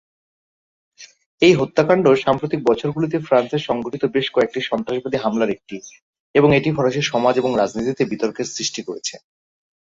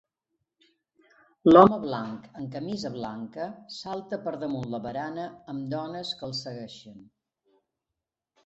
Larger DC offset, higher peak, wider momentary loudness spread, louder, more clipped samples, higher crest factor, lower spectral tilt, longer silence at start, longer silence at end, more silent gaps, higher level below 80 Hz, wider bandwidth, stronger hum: neither; about the same, -2 dBFS vs -2 dBFS; second, 9 LU vs 20 LU; first, -19 LUFS vs -26 LUFS; neither; second, 18 dB vs 26 dB; second, -5 dB/octave vs -7 dB/octave; second, 1 s vs 1.45 s; second, 0.65 s vs 1.4 s; first, 1.26-1.38 s, 6.02-6.13 s, 6.20-6.34 s vs none; first, -54 dBFS vs -64 dBFS; about the same, 7.8 kHz vs 8 kHz; neither